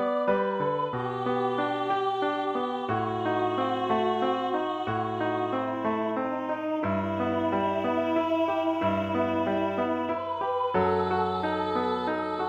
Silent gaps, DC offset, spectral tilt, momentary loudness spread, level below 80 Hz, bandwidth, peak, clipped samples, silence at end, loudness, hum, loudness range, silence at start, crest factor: none; under 0.1%; -7.5 dB/octave; 4 LU; -64 dBFS; 8.6 kHz; -14 dBFS; under 0.1%; 0 s; -28 LUFS; none; 1 LU; 0 s; 14 dB